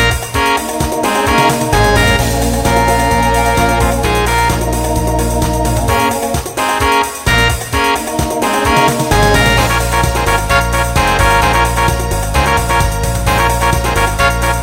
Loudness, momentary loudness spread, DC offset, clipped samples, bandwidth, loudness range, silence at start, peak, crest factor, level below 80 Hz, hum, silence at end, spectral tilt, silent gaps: -12 LUFS; 5 LU; under 0.1%; under 0.1%; 16.5 kHz; 2 LU; 0 s; 0 dBFS; 12 dB; -20 dBFS; none; 0 s; -4 dB/octave; none